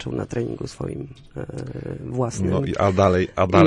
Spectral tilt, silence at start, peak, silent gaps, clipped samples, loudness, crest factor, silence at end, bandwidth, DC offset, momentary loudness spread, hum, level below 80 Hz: -7 dB/octave; 0 s; -4 dBFS; none; under 0.1%; -23 LUFS; 18 dB; 0 s; 11 kHz; under 0.1%; 15 LU; none; -46 dBFS